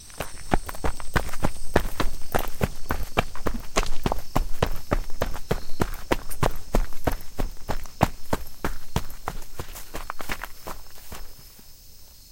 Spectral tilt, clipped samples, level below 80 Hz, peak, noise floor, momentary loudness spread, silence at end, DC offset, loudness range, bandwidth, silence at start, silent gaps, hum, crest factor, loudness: -5 dB/octave; under 0.1%; -30 dBFS; 0 dBFS; -45 dBFS; 15 LU; 0.25 s; under 0.1%; 7 LU; 17 kHz; 0 s; none; none; 22 dB; -30 LUFS